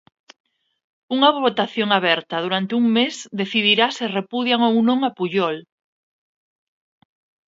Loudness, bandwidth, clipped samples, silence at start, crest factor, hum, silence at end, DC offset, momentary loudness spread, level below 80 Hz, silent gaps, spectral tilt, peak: -19 LUFS; 7.8 kHz; under 0.1%; 1.1 s; 20 dB; none; 1.85 s; under 0.1%; 8 LU; -72 dBFS; none; -4.5 dB/octave; 0 dBFS